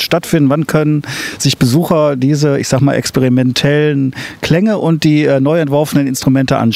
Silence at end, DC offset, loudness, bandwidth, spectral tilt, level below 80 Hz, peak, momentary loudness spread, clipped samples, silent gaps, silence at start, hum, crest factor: 0 s; under 0.1%; -12 LUFS; 16 kHz; -6 dB/octave; -44 dBFS; 0 dBFS; 4 LU; under 0.1%; none; 0 s; none; 10 dB